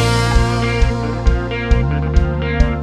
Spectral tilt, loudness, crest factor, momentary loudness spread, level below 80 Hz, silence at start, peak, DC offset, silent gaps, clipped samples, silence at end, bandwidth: -6 dB/octave; -17 LUFS; 14 dB; 3 LU; -18 dBFS; 0 s; 0 dBFS; under 0.1%; none; under 0.1%; 0 s; 12 kHz